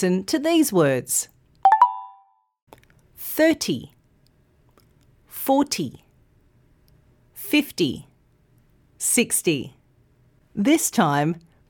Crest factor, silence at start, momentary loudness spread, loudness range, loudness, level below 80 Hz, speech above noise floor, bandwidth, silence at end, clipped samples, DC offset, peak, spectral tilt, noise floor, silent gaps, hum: 20 dB; 0 s; 17 LU; 7 LU; -21 LUFS; -62 dBFS; 39 dB; 19 kHz; 0.3 s; under 0.1%; under 0.1%; -4 dBFS; -4 dB/octave; -60 dBFS; 2.62-2.67 s; none